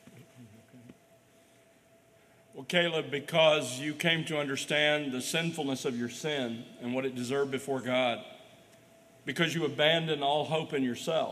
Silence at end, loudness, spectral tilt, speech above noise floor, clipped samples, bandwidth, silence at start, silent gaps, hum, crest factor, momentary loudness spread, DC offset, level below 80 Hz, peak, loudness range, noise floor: 0 s; -30 LUFS; -4 dB/octave; 32 dB; under 0.1%; 15 kHz; 0.05 s; none; none; 22 dB; 9 LU; under 0.1%; -78 dBFS; -10 dBFS; 5 LU; -62 dBFS